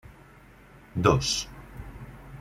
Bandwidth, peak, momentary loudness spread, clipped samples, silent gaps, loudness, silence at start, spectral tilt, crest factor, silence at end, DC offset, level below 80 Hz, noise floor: 16 kHz; -6 dBFS; 22 LU; under 0.1%; none; -26 LUFS; 0.1 s; -4.5 dB/octave; 24 dB; 0 s; under 0.1%; -46 dBFS; -52 dBFS